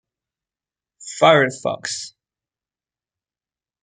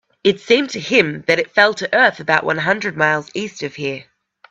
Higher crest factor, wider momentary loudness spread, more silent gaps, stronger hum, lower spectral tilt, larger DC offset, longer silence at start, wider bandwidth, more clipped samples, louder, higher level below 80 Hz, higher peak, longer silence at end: about the same, 22 dB vs 18 dB; first, 22 LU vs 11 LU; neither; neither; about the same, -3.5 dB/octave vs -4 dB/octave; neither; first, 1 s vs 0.25 s; first, 9.4 kHz vs 8.2 kHz; neither; about the same, -18 LUFS vs -17 LUFS; second, -70 dBFS vs -62 dBFS; about the same, -2 dBFS vs 0 dBFS; first, 1.75 s vs 0.5 s